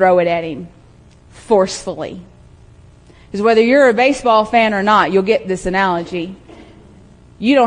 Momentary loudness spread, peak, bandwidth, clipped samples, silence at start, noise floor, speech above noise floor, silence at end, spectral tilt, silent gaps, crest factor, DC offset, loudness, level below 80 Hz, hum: 16 LU; 0 dBFS; 10.5 kHz; under 0.1%; 0 s; -45 dBFS; 31 dB; 0 s; -5 dB/octave; none; 16 dB; under 0.1%; -14 LUFS; -46 dBFS; none